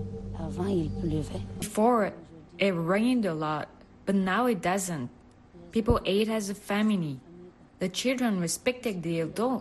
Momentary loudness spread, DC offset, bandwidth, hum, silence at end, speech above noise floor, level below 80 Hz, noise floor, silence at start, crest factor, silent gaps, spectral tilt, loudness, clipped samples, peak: 12 LU; under 0.1%; 12.5 kHz; none; 0 s; 24 dB; -46 dBFS; -52 dBFS; 0 s; 18 dB; none; -5.5 dB/octave; -29 LUFS; under 0.1%; -10 dBFS